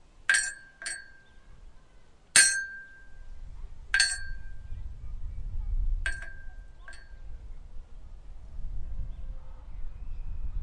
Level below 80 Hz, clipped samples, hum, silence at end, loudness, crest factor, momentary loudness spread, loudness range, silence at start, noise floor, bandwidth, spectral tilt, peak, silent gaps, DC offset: -38 dBFS; under 0.1%; none; 0 s; -27 LUFS; 26 dB; 26 LU; 19 LU; 0.15 s; -53 dBFS; 11.5 kHz; 0.5 dB/octave; -6 dBFS; none; under 0.1%